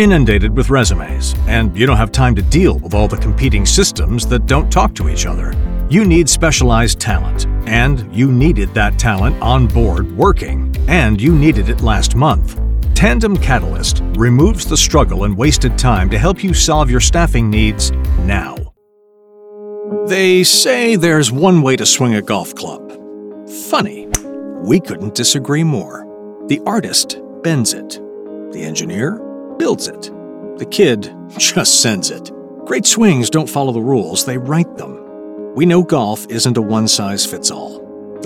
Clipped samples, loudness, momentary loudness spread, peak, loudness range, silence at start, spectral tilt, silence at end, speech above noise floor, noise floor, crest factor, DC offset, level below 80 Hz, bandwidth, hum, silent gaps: under 0.1%; -13 LUFS; 17 LU; 0 dBFS; 5 LU; 0 s; -4.5 dB/octave; 0 s; 38 dB; -51 dBFS; 14 dB; under 0.1%; -18 dBFS; 16.5 kHz; none; none